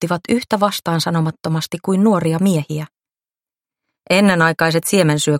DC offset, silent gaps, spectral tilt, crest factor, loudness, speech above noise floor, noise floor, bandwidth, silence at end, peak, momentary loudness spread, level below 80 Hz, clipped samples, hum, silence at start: under 0.1%; none; -5 dB/octave; 18 dB; -16 LUFS; over 74 dB; under -90 dBFS; 16.5 kHz; 0 s; 0 dBFS; 8 LU; -58 dBFS; under 0.1%; none; 0 s